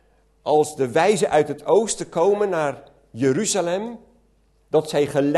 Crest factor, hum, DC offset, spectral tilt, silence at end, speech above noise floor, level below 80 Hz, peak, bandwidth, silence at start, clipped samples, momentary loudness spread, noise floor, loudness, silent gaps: 16 dB; none; under 0.1%; -4.5 dB/octave; 0 s; 40 dB; -58 dBFS; -4 dBFS; 12.5 kHz; 0.45 s; under 0.1%; 8 LU; -60 dBFS; -21 LUFS; none